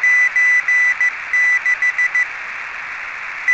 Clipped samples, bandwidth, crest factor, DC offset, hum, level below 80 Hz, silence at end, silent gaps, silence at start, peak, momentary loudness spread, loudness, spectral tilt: under 0.1%; 8.6 kHz; 10 dB; under 0.1%; none; -60 dBFS; 0 s; none; 0 s; -6 dBFS; 14 LU; -14 LUFS; 1 dB/octave